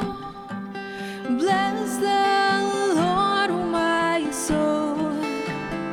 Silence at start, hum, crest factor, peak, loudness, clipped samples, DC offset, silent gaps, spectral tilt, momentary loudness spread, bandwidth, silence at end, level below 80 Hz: 0 s; none; 14 dB; -8 dBFS; -23 LUFS; under 0.1%; under 0.1%; none; -4 dB/octave; 12 LU; 17.5 kHz; 0 s; -52 dBFS